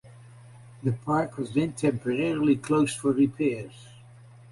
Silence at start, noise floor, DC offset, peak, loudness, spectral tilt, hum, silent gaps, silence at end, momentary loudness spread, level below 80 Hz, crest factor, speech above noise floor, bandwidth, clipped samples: 0.05 s; -50 dBFS; under 0.1%; -12 dBFS; -26 LUFS; -6.5 dB/octave; none; none; 0.5 s; 7 LU; -60 dBFS; 16 dB; 24 dB; 11.5 kHz; under 0.1%